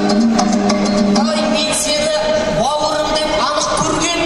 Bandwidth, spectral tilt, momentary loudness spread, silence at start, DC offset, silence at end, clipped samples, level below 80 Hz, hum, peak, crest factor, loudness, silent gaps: 12.5 kHz; -3.5 dB/octave; 2 LU; 0 s; under 0.1%; 0 s; under 0.1%; -36 dBFS; none; 0 dBFS; 14 dB; -15 LUFS; none